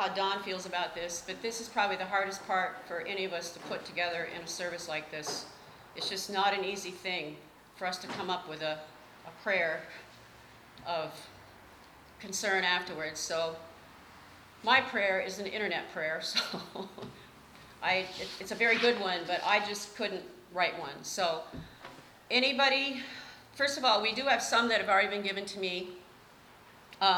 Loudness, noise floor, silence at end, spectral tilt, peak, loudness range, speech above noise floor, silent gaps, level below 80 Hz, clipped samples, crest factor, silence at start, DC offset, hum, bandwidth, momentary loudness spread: -32 LUFS; -56 dBFS; 0 s; -2 dB/octave; -12 dBFS; 7 LU; 24 dB; none; -70 dBFS; under 0.1%; 22 dB; 0 s; under 0.1%; none; over 20 kHz; 19 LU